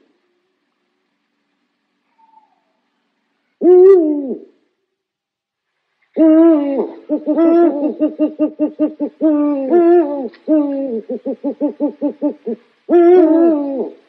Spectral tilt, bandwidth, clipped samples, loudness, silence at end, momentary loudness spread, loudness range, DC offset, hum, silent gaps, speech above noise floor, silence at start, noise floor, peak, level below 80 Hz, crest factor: -9.5 dB/octave; 3.7 kHz; under 0.1%; -14 LUFS; 0.15 s; 14 LU; 3 LU; under 0.1%; none; none; 67 dB; 3.6 s; -81 dBFS; 0 dBFS; -72 dBFS; 14 dB